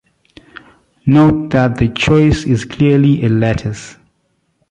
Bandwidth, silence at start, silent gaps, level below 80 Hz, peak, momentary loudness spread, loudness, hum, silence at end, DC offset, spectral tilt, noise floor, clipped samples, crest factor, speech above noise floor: 9.8 kHz; 1.05 s; none; -34 dBFS; -2 dBFS; 10 LU; -13 LUFS; none; 0.8 s; under 0.1%; -7 dB/octave; -63 dBFS; under 0.1%; 12 dB; 51 dB